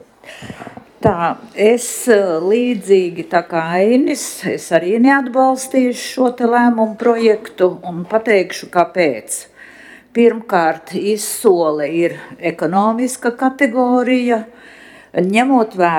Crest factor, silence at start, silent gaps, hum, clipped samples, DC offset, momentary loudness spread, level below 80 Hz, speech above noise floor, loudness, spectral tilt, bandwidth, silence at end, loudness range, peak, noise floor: 16 dB; 0.25 s; none; none; under 0.1%; under 0.1%; 10 LU; -56 dBFS; 26 dB; -15 LUFS; -5 dB/octave; 17.5 kHz; 0 s; 2 LU; 0 dBFS; -40 dBFS